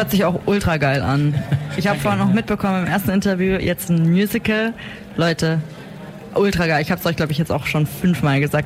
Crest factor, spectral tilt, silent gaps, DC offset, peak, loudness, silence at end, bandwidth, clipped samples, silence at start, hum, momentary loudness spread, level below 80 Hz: 10 dB; -6.5 dB/octave; none; under 0.1%; -8 dBFS; -19 LUFS; 0 s; 16 kHz; under 0.1%; 0 s; none; 7 LU; -40 dBFS